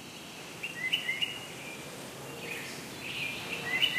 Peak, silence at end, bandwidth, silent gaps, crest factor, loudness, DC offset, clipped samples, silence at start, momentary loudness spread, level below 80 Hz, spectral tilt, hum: -14 dBFS; 0 s; 15.5 kHz; none; 22 dB; -35 LUFS; under 0.1%; under 0.1%; 0 s; 12 LU; -70 dBFS; -2 dB/octave; none